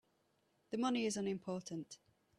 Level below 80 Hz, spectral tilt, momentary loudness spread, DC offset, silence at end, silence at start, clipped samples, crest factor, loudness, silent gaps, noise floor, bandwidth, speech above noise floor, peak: -82 dBFS; -4.5 dB/octave; 15 LU; under 0.1%; 0.45 s; 0.7 s; under 0.1%; 18 dB; -41 LUFS; none; -78 dBFS; 12.5 kHz; 39 dB; -24 dBFS